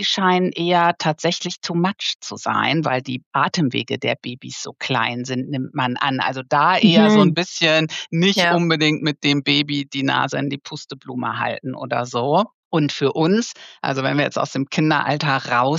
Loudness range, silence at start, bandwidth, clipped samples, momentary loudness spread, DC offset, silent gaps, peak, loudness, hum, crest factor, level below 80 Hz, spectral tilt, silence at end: 6 LU; 0 s; 11.5 kHz; under 0.1%; 10 LU; under 0.1%; 2.15-2.20 s, 3.26-3.31 s, 12.54-12.71 s; -2 dBFS; -19 LUFS; none; 18 dB; -74 dBFS; -5 dB/octave; 0 s